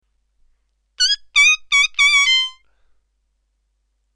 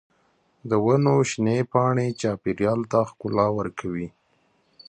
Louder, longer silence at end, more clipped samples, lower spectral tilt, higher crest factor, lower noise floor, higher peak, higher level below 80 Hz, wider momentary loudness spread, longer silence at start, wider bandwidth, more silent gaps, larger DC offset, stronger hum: first, -13 LUFS vs -23 LUFS; first, 1.65 s vs 0.8 s; neither; second, 6.5 dB/octave vs -7 dB/octave; about the same, 16 dB vs 18 dB; about the same, -68 dBFS vs -66 dBFS; about the same, -4 dBFS vs -6 dBFS; about the same, -54 dBFS vs -56 dBFS; second, 6 LU vs 11 LU; first, 1 s vs 0.65 s; first, 13.5 kHz vs 9.6 kHz; neither; neither; neither